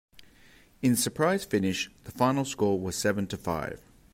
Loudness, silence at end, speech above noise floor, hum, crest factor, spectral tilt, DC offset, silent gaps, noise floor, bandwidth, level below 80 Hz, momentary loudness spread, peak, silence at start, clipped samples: -28 LUFS; 0.35 s; 30 dB; none; 18 dB; -4.5 dB/octave; under 0.1%; none; -58 dBFS; 16 kHz; -58 dBFS; 8 LU; -10 dBFS; 0.15 s; under 0.1%